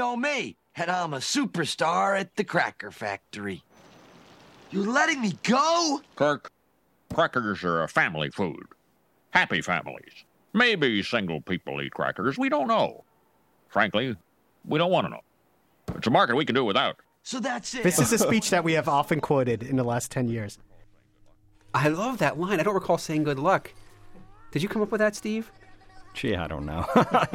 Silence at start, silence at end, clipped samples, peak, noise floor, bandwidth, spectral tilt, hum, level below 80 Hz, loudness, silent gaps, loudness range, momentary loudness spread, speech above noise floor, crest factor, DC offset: 0 s; 0 s; under 0.1%; -6 dBFS; -68 dBFS; 16.5 kHz; -4.5 dB/octave; none; -56 dBFS; -26 LUFS; none; 4 LU; 12 LU; 42 dB; 20 dB; under 0.1%